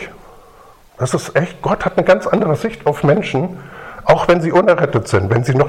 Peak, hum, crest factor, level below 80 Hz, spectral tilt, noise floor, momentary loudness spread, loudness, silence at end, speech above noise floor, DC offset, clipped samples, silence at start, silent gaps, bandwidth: 0 dBFS; none; 16 dB; -42 dBFS; -6.5 dB/octave; -44 dBFS; 10 LU; -15 LUFS; 0 s; 29 dB; under 0.1%; under 0.1%; 0 s; none; 14 kHz